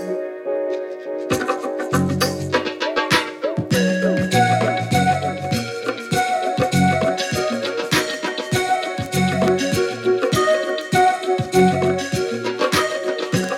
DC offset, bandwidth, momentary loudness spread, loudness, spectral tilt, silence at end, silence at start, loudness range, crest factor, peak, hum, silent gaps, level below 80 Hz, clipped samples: under 0.1%; 17 kHz; 7 LU; -20 LUFS; -5 dB/octave; 0 s; 0 s; 2 LU; 16 dB; -4 dBFS; none; none; -50 dBFS; under 0.1%